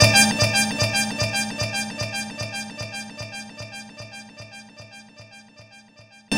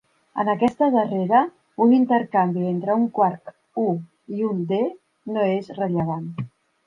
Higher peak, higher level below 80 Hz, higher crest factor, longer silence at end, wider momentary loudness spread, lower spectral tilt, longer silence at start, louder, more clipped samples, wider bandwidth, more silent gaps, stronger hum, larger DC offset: first, 0 dBFS vs -6 dBFS; first, -48 dBFS vs -66 dBFS; first, 24 dB vs 16 dB; second, 0 s vs 0.4 s; first, 24 LU vs 14 LU; second, -2.5 dB/octave vs -9 dB/octave; second, 0 s vs 0.35 s; about the same, -22 LUFS vs -22 LUFS; neither; first, 16.5 kHz vs 5.6 kHz; neither; neither; neither